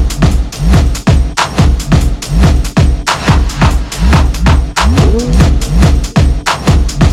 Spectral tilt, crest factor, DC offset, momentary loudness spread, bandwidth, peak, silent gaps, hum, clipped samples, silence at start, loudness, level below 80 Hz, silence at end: -5.5 dB/octave; 8 dB; under 0.1%; 2 LU; 14.5 kHz; 0 dBFS; none; none; 0.3%; 0 s; -11 LUFS; -12 dBFS; 0 s